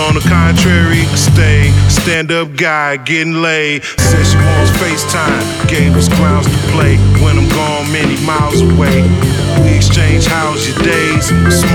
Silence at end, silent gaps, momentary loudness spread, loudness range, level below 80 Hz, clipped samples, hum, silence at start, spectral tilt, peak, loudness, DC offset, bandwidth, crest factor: 0 s; none; 4 LU; 1 LU; -22 dBFS; under 0.1%; none; 0 s; -5 dB/octave; 0 dBFS; -10 LUFS; under 0.1%; 18 kHz; 10 dB